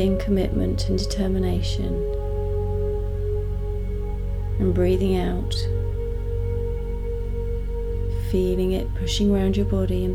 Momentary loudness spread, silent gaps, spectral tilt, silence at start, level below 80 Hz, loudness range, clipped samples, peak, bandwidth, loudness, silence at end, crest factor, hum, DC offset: 8 LU; none; -7 dB/octave; 0 s; -26 dBFS; 2 LU; under 0.1%; -10 dBFS; 13.5 kHz; -25 LUFS; 0 s; 12 dB; none; under 0.1%